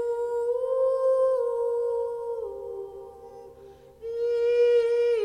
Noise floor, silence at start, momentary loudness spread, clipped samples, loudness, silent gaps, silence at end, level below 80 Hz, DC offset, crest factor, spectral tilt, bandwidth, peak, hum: -49 dBFS; 0 s; 21 LU; under 0.1%; -25 LUFS; none; 0 s; -64 dBFS; under 0.1%; 12 dB; -4 dB/octave; 9.4 kHz; -14 dBFS; none